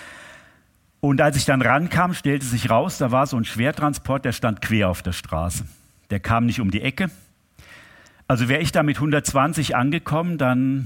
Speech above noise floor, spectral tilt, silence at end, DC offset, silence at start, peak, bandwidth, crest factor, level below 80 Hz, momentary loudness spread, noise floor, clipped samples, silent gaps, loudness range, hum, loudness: 39 dB; -5.5 dB/octave; 0 s; under 0.1%; 0 s; -2 dBFS; 17 kHz; 20 dB; -44 dBFS; 9 LU; -59 dBFS; under 0.1%; none; 4 LU; none; -21 LUFS